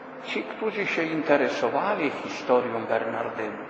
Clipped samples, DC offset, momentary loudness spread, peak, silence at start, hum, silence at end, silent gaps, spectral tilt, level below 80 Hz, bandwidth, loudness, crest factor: under 0.1%; under 0.1%; 8 LU; -6 dBFS; 0 s; none; 0 s; none; -5 dB/octave; -72 dBFS; 8.4 kHz; -26 LUFS; 20 dB